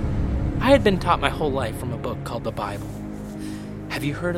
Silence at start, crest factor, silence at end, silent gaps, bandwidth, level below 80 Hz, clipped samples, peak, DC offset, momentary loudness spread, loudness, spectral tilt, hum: 0 s; 22 dB; 0 s; none; 16.5 kHz; -34 dBFS; under 0.1%; -2 dBFS; under 0.1%; 15 LU; -24 LUFS; -6.5 dB/octave; none